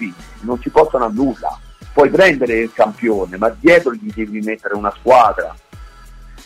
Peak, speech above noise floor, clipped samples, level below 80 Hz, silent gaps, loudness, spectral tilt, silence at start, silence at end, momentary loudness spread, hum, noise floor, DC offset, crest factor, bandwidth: 0 dBFS; 23 dB; under 0.1%; -40 dBFS; none; -15 LUFS; -5.5 dB/octave; 0 s; 0.05 s; 14 LU; none; -38 dBFS; under 0.1%; 14 dB; 15 kHz